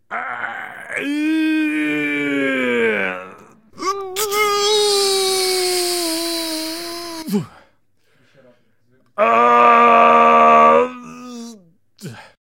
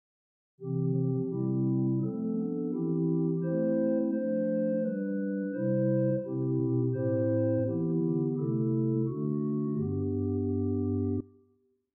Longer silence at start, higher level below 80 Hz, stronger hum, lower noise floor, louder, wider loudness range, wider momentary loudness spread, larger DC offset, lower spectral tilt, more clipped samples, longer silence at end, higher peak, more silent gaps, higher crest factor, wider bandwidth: second, 0.1 s vs 0.6 s; about the same, -64 dBFS vs -68 dBFS; neither; second, -62 dBFS vs -70 dBFS; first, -16 LUFS vs -30 LUFS; first, 9 LU vs 2 LU; first, 21 LU vs 4 LU; neither; second, -2.5 dB/octave vs -14 dB/octave; neither; second, 0.25 s vs 0.7 s; first, 0 dBFS vs -18 dBFS; neither; first, 18 dB vs 12 dB; first, 16.5 kHz vs 1.7 kHz